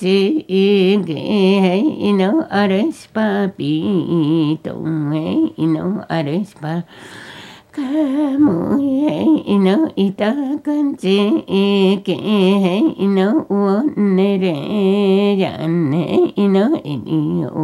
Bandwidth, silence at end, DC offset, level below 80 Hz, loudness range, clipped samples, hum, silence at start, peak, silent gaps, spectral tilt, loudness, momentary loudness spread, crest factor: 11.5 kHz; 0 s; under 0.1%; -60 dBFS; 4 LU; under 0.1%; none; 0 s; -2 dBFS; none; -8 dB/octave; -16 LUFS; 7 LU; 14 dB